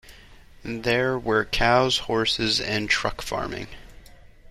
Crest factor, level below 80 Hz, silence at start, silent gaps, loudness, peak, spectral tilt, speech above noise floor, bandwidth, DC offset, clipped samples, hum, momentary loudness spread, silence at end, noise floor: 20 dB; -42 dBFS; 0.05 s; none; -23 LUFS; -6 dBFS; -4 dB/octave; 24 dB; 14.5 kHz; under 0.1%; under 0.1%; none; 14 LU; 0.05 s; -48 dBFS